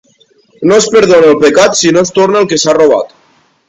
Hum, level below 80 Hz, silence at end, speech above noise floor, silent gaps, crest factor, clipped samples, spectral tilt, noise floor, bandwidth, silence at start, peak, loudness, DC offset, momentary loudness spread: none; -48 dBFS; 0.6 s; 43 dB; none; 8 dB; 0.9%; -3.5 dB/octave; -50 dBFS; 9.4 kHz; 0.6 s; 0 dBFS; -7 LUFS; under 0.1%; 6 LU